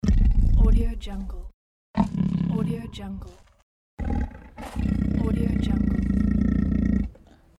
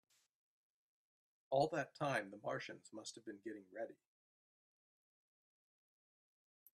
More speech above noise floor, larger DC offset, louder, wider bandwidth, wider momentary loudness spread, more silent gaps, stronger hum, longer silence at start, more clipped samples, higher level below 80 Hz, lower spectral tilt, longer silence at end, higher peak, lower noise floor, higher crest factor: second, 19 dB vs over 46 dB; neither; first, -25 LUFS vs -44 LUFS; second, 10.5 kHz vs 13 kHz; about the same, 14 LU vs 14 LU; first, 1.54-1.94 s, 3.63-3.97 s vs none; neither; second, 0.05 s vs 1.5 s; neither; first, -26 dBFS vs -88 dBFS; first, -8.5 dB/octave vs -5 dB/octave; second, 0.45 s vs 2.8 s; first, -6 dBFS vs -22 dBFS; second, -48 dBFS vs under -90 dBFS; second, 16 dB vs 24 dB